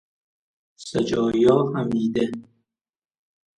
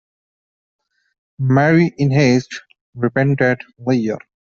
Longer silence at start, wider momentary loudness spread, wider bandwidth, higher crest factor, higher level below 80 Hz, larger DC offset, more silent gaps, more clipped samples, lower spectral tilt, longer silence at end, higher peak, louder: second, 0.8 s vs 1.4 s; about the same, 13 LU vs 11 LU; first, 11 kHz vs 7.2 kHz; about the same, 20 dB vs 16 dB; about the same, -58 dBFS vs -56 dBFS; neither; second, none vs 2.81-2.93 s; neither; about the same, -7 dB/octave vs -7 dB/octave; first, 1.15 s vs 0.25 s; about the same, -4 dBFS vs -2 dBFS; second, -22 LUFS vs -17 LUFS